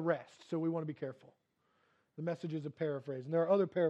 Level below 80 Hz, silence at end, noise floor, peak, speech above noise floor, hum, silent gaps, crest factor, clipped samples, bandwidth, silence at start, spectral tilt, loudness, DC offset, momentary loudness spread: -88 dBFS; 0 s; -76 dBFS; -18 dBFS; 41 dB; none; none; 18 dB; under 0.1%; 8.2 kHz; 0 s; -8.5 dB/octave; -37 LUFS; under 0.1%; 13 LU